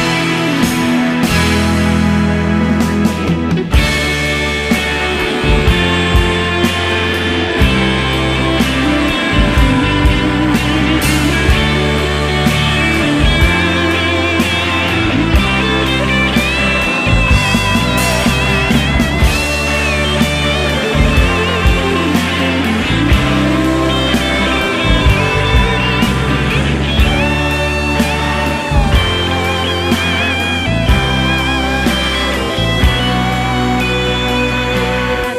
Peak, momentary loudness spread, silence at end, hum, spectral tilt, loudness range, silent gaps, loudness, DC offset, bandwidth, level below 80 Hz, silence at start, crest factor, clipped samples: 0 dBFS; 3 LU; 0 s; none; -5 dB/octave; 2 LU; none; -13 LUFS; under 0.1%; 15.5 kHz; -20 dBFS; 0 s; 12 dB; under 0.1%